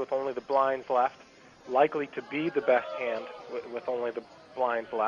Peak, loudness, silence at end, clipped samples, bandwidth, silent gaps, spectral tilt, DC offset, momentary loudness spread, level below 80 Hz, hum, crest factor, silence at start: -10 dBFS; -30 LUFS; 0 s; under 0.1%; 7.2 kHz; none; -6 dB/octave; under 0.1%; 11 LU; -74 dBFS; none; 20 dB; 0 s